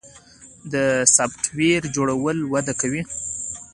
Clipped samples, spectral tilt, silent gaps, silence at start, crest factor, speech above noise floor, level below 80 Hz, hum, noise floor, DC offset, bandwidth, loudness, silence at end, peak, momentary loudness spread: under 0.1%; -3.5 dB/octave; none; 0.05 s; 22 dB; 26 dB; -54 dBFS; none; -47 dBFS; under 0.1%; 11.5 kHz; -20 LUFS; 0.05 s; 0 dBFS; 12 LU